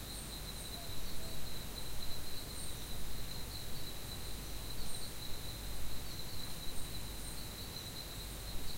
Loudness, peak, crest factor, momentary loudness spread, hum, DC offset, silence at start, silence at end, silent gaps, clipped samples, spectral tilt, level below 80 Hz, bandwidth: -45 LUFS; -24 dBFS; 12 dB; 1 LU; none; under 0.1%; 0 s; 0 s; none; under 0.1%; -3 dB/octave; -48 dBFS; 16 kHz